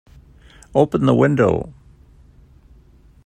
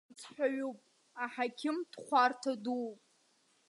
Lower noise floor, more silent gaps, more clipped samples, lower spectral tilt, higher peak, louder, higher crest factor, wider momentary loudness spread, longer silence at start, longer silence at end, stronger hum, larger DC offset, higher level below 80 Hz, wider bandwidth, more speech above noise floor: second, -49 dBFS vs -72 dBFS; neither; neither; first, -8 dB/octave vs -3.5 dB/octave; first, 0 dBFS vs -16 dBFS; first, -17 LUFS vs -35 LUFS; about the same, 20 dB vs 20 dB; second, 10 LU vs 16 LU; first, 0.75 s vs 0.1 s; first, 1.55 s vs 0.75 s; neither; neither; first, -46 dBFS vs under -90 dBFS; second, 9.4 kHz vs 11.5 kHz; second, 33 dB vs 37 dB